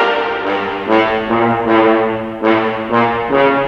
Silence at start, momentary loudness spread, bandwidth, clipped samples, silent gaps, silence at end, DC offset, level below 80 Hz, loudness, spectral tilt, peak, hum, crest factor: 0 s; 6 LU; 6.6 kHz; under 0.1%; none; 0 s; under 0.1%; -46 dBFS; -14 LUFS; -7 dB/octave; 0 dBFS; none; 14 dB